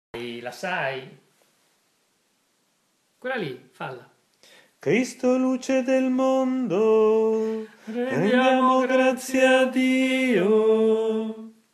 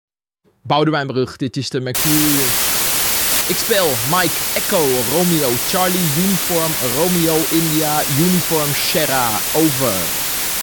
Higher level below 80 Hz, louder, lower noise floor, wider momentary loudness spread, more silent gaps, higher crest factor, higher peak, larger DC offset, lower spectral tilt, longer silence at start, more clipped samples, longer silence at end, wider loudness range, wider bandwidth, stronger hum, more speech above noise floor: second, -74 dBFS vs -44 dBFS; second, -22 LUFS vs -15 LUFS; first, -69 dBFS vs -62 dBFS; first, 16 LU vs 4 LU; neither; about the same, 18 dB vs 14 dB; second, -6 dBFS vs -2 dBFS; neither; first, -5 dB/octave vs -3 dB/octave; second, 0.15 s vs 0.65 s; neither; first, 0.25 s vs 0 s; first, 17 LU vs 1 LU; second, 13 kHz vs 19.5 kHz; neither; about the same, 47 dB vs 45 dB